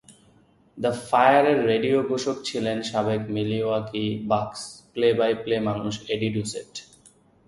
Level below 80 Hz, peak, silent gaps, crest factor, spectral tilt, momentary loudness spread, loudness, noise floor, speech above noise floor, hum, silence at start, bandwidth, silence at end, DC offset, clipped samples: -58 dBFS; -4 dBFS; none; 20 dB; -5.5 dB/octave; 13 LU; -24 LUFS; -58 dBFS; 35 dB; none; 0.1 s; 11.5 kHz; 0.65 s; under 0.1%; under 0.1%